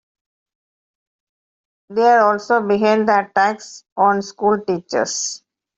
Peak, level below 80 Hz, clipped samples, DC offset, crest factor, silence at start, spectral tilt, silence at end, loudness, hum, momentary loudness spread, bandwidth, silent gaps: -2 dBFS; -66 dBFS; under 0.1%; under 0.1%; 16 dB; 1.9 s; -3.5 dB/octave; 0.4 s; -17 LUFS; none; 11 LU; 8.2 kHz; 3.92-3.96 s